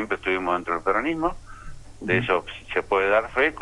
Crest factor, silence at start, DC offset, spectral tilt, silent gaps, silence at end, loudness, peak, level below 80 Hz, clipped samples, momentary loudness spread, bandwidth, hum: 16 dB; 0 s; under 0.1%; -6 dB/octave; none; 0 s; -24 LUFS; -8 dBFS; -46 dBFS; under 0.1%; 8 LU; 11.5 kHz; none